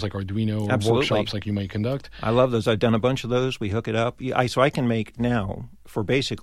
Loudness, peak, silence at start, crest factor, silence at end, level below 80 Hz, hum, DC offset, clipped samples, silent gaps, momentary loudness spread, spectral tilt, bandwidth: -24 LUFS; -6 dBFS; 0 s; 18 dB; 0 s; -48 dBFS; none; under 0.1%; under 0.1%; none; 8 LU; -6.5 dB/octave; 13.5 kHz